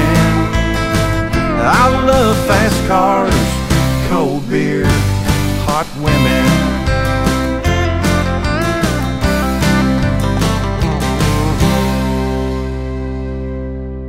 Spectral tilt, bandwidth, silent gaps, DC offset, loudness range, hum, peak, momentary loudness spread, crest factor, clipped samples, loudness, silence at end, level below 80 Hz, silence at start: -5.5 dB/octave; 16.5 kHz; none; under 0.1%; 3 LU; none; 0 dBFS; 7 LU; 14 dB; under 0.1%; -14 LUFS; 0 s; -22 dBFS; 0 s